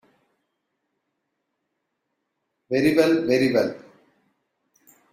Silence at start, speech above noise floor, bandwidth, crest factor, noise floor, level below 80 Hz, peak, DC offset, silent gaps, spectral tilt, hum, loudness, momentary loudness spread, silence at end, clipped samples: 2.7 s; 58 dB; 15.5 kHz; 22 dB; -78 dBFS; -64 dBFS; -4 dBFS; under 0.1%; none; -6 dB/octave; none; -21 LUFS; 9 LU; 1.35 s; under 0.1%